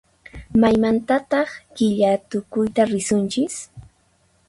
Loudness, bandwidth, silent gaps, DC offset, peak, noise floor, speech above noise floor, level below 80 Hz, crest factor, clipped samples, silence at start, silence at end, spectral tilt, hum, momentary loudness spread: -20 LUFS; 11.5 kHz; none; under 0.1%; -4 dBFS; -61 dBFS; 42 dB; -50 dBFS; 16 dB; under 0.1%; 0.35 s; 0.65 s; -5.5 dB/octave; none; 9 LU